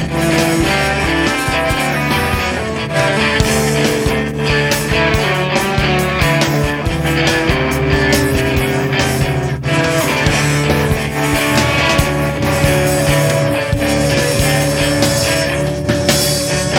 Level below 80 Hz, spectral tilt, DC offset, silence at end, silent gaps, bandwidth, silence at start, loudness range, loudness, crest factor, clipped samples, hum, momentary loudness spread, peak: -28 dBFS; -4.5 dB/octave; under 0.1%; 0 s; none; 19 kHz; 0 s; 1 LU; -14 LUFS; 14 dB; under 0.1%; none; 3 LU; 0 dBFS